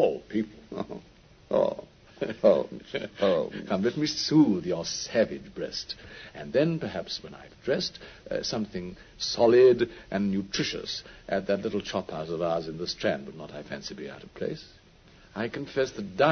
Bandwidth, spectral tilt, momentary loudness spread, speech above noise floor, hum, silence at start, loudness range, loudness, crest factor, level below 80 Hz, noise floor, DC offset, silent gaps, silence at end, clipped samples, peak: 6.6 kHz; -5 dB/octave; 16 LU; 27 dB; none; 0 s; 7 LU; -28 LUFS; 20 dB; -58 dBFS; -55 dBFS; under 0.1%; none; 0 s; under 0.1%; -8 dBFS